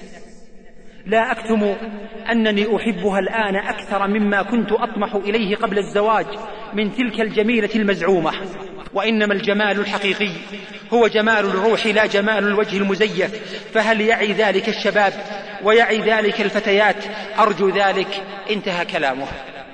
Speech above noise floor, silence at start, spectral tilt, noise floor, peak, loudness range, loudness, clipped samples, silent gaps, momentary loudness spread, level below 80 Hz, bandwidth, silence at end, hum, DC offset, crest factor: 21 dB; 0 s; -5 dB/octave; -40 dBFS; -4 dBFS; 3 LU; -18 LUFS; under 0.1%; none; 11 LU; -50 dBFS; 9.8 kHz; 0 s; none; 0.3%; 16 dB